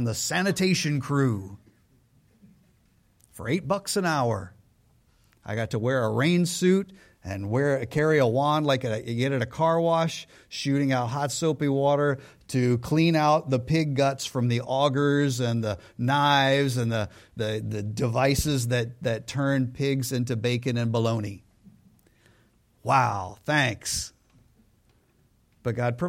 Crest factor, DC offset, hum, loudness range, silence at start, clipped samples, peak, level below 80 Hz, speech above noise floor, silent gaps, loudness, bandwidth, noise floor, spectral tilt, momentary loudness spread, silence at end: 18 dB; under 0.1%; none; 6 LU; 0 s; under 0.1%; -8 dBFS; -52 dBFS; 39 dB; none; -25 LUFS; 16.5 kHz; -64 dBFS; -5.5 dB/octave; 10 LU; 0 s